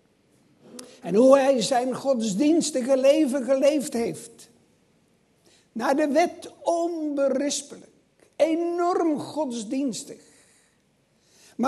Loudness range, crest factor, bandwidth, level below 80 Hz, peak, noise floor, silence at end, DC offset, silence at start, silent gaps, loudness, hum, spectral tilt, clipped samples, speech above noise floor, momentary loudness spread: 7 LU; 20 dB; 12.5 kHz; -74 dBFS; -4 dBFS; -65 dBFS; 0 s; under 0.1%; 0.75 s; none; -23 LUFS; none; -4.5 dB/octave; under 0.1%; 42 dB; 20 LU